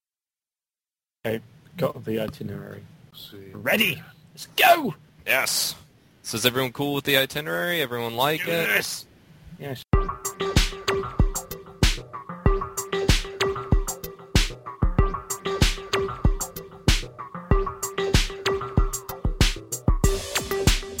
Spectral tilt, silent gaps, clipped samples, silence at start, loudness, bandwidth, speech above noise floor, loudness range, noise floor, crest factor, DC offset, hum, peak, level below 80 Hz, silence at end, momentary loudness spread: -4 dB/octave; none; under 0.1%; 1.25 s; -25 LUFS; 17 kHz; over 65 dB; 4 LU; under -90 dBFS; 20 dB; under 0.1%; none; -4 dBFS; -30 dBFS; 0 s; 14 LU